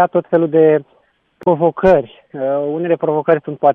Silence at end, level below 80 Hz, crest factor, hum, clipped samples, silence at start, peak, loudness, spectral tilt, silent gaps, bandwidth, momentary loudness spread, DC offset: 0 s; -46 dBFS; 14 dB; none; under 0.1%; 0 s; 0 dBFS; -15 LUFS; -9.5 dB/octave; none; 4.2 kHz; 8 LU; under 0.1%